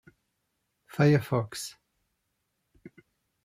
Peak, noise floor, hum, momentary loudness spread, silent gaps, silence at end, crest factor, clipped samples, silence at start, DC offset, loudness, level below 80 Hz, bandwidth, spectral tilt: -10 dBFS; -79 dBFS; none; 18 LU; none; 0.55 s; 22 dB; under 0.1%; 0.95 s; under 0.1%; -27 LUFS; -66 dBFS; 15.5 kHz; -6.5 dB/octave